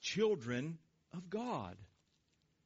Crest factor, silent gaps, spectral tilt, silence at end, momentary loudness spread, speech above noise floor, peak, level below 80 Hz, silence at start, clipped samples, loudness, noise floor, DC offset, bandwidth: 18 dB; none; -4.5 dB/octave; 0.8 s; 18 LU; 39 dB; -24 dBFS; -76 dBFS; 0 s; under 0.1%; -40 LUFS; -78 dBFS; under 0.1%; 7.6 kHz